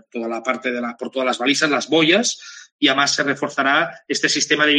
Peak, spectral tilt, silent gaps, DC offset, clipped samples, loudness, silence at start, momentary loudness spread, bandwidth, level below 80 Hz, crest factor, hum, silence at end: -2 dBFS; -2 dB/octave; 2.72-2.79 s; under 0.1%; under 0.1%; -18 LUFS; 0.15 s; 10 LU; 10 kHz; -72 dBFS; 18 dB; none; 0 s